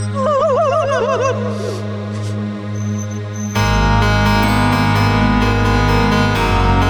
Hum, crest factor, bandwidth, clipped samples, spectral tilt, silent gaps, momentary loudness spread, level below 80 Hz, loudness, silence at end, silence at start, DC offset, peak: none; 12 dB; 18 kHz; under 0.1%; -6 dB/octave; none; 9 LU; -24 dBFS; -16 LUFS; 0 s; 0 s; under 0.1%; -2 dBFS